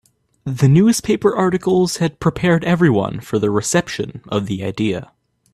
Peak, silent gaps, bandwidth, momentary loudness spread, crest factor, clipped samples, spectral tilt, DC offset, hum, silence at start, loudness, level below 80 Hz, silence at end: -2 dBFS; none; 14.5 kHz; 10 LU; 16 dB; under 0.1%; -6 dB/octave; under 0.1%; none; 0.45 s; -17 LUFS; -48 dBFS; 0.5 s